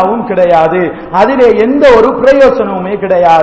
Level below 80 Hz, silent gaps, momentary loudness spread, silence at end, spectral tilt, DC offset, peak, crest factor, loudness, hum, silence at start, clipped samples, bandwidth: -36 dBFS; none; 8 LU; 0 s; -6.5 dB/octave; under 0.1%; 0 dBFS; 8 dB; -8 LUFS; none; 0 s; 7%; 8 kHz